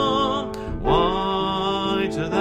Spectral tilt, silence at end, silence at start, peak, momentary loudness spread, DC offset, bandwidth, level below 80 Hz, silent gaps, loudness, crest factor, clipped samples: -6 dB/octave; 0 s; 0 s; -6 dBFS; 7 LU; under 0.1%; 13 kHz; -36 dBFS; none; -22 LUFS; 16 dB; under 0.1%